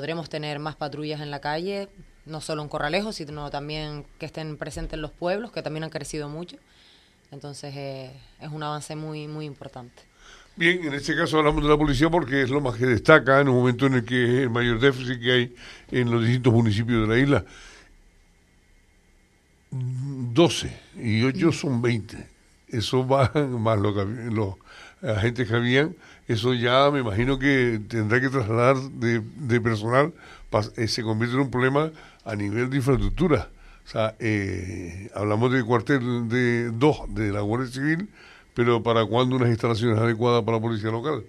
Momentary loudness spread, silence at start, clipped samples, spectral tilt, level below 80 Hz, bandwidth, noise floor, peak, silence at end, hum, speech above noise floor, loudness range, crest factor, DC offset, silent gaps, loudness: 14 LU; 0 s; under 0.1%; -6.5 dB/octave; -44 dBFS; 12 kHz; -60 dBFS; 0 dBFS; 0 s; none; 37 dB; 12 LU; 24 dB; under 0.1%; none; -24 LUFS